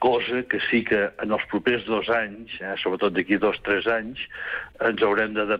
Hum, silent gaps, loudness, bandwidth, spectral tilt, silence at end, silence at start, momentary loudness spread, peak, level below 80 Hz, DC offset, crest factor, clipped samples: none; none; -24 LUFS; 5.4 kHz; -7 dB/octave; 0 s; 0 s; 9 LU; -10 dBFS; -56 dBFS; under 0.1%; 14 dB; under 0.1%